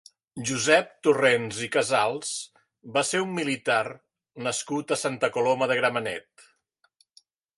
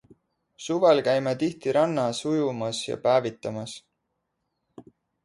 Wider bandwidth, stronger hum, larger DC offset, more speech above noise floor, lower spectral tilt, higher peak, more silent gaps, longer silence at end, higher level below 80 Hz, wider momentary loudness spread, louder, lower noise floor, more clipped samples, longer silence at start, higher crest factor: about the same, 11.5 kHz vs 11.5 kHz; neither; neither; second, 44 dB vs 54 dB; second, -3 dB/octave vs -5 dB/octave; first, -4 dBFS vs -8 dBFS; neither; first, 1.35 s vs 0.45 s; about the same, -70 dBFS vs -68 dBFS; second, 12 LU vs 15 LU; about the same, -25 LUFS vs -25 LUFS; second, -70 dBFS vs -79 dBFS; neither; second, 0.35 s vs 0.6 s; about the same, 22 dB vs 18 dB